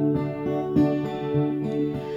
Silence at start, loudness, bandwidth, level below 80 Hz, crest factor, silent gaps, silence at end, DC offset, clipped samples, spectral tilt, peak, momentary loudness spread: 0 s; -25 LUFS; 7.2 kHz; -52 dBFS; 14 dB; none; 0 s; under 0.1%; under 0.1%; -9.5 dB/octave; -10 dBFS; 5 LU